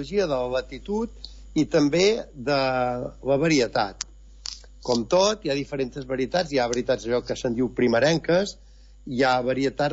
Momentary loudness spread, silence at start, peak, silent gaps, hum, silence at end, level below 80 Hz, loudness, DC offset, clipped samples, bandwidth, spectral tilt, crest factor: 13 LU; 0 s; -10 dBFS; none; none; 0 s; -46 dBFS; -24 LUFS; under 0.1%; under 0.1%; 8 kHz; -5 dB/octave; 14 dB